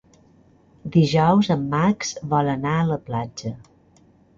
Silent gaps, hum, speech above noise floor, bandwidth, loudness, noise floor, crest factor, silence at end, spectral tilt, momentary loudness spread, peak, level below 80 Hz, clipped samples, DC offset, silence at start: none; none; 35 dB; 7.6 kHz; -21 LUFS; -55 dBFS; 18 dB; 0.8 s; -6.5 dB/octave; 16 LU; -6 dBFS; -52 dBFS; under 0.1%; under 0.1%; 0.85 s